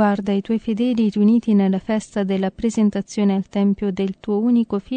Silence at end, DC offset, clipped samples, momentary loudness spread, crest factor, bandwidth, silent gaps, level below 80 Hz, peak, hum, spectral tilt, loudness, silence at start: 0 s; under 0.1%; under 0.1%; 6 LU; 14 dB; 9.2 kHz; none; -50 dBFS; -6 dBFS; none; -7.5 dB/octave; -20 LUFS; 0 s